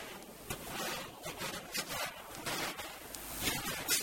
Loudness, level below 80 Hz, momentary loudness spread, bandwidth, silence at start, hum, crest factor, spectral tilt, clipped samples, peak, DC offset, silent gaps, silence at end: -39 LUFS; -60 dBFS; 9 LU; 19.5 kHz; 0 s; none; 22 dB; -1.5 dB/octave; under 0.1%; -18 dBFS; under 0.1%; none; 0 s